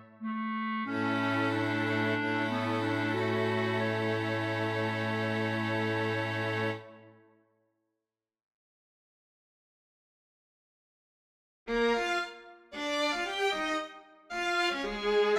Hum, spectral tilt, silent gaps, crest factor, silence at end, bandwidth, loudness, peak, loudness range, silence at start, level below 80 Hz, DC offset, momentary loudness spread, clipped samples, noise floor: none; -5.5 dB/octave; 8.43-11.66 s; 16 dB; 0 s; 14 kHz; -31 LUFS; -18 dBFS; 7 LU; 0 s; -64 dBFS; under 0.1%; 7 LU; under 0.1%; -90 dBFS